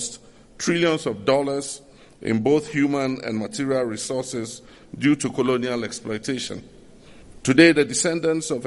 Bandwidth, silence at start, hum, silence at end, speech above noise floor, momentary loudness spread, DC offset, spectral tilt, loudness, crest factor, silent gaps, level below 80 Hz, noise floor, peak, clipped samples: 11.5 kHz; 0 s; none; 0 s; 24 dB; 14 LU; under 0.1%; -4.5 dB/octave; -22 LUFS; 22 dB; none; -56 dBFS; -46 dBFS; -2 dBFS; under 0.1%